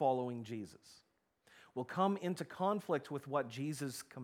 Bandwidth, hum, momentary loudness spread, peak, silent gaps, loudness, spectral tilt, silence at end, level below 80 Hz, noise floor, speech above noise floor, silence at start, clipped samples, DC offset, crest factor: 17.5 kHz; none; 12 LU; -20 dBFS; none; -39 LUFS; -6 dB/octave; 0 s; -84 dBFS; -70 dBFS; 31 dB; 0 s; under 0.1%; under 0.1%; 20 dB